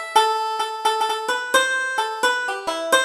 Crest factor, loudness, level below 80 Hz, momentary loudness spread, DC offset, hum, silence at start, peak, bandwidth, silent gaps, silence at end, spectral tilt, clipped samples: 18 dB; -21 LUFS; -66 dBFS; 5 LU; under 0.1%; none; 0 s; -2 dBFS; 17.5 kHz; none; 0 s; 1 dB/octave; under 0.1%